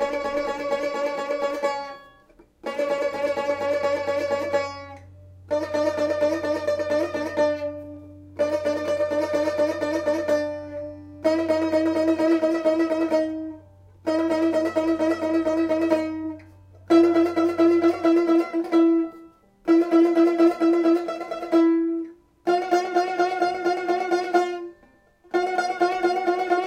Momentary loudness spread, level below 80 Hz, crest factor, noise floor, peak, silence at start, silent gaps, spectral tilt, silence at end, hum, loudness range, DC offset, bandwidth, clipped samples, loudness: 13 LU; -62 dBFS; 16 dB; -57 dBFS; -6 dBFS; 0 s; none; -5.5 dB/octave; 0 s; none; 6 LU; under 0.1%; 9.8 kHz; under 0.1%; -23 LUFS